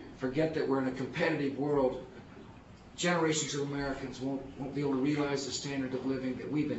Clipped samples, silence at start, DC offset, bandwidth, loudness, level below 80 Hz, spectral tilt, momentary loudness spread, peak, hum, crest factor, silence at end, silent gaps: under 0.1%; 0 s; under 0.1%; 8 kHz; -33 LUFS; -60 dBFS; -4.5 dB/octave; 17 LU; -16 dBFS; none; 18 dB; 0 s; none